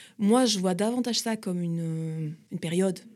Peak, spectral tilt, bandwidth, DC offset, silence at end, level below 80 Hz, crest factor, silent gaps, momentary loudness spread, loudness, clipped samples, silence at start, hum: -10 dBFS; -5 dB/octave; 14.5 kHz; under 0.1%; 0.05 s; -80 dBFS; 16 dB; none; 12 LU; -27 LUFS; under 0.1%; 0 s; none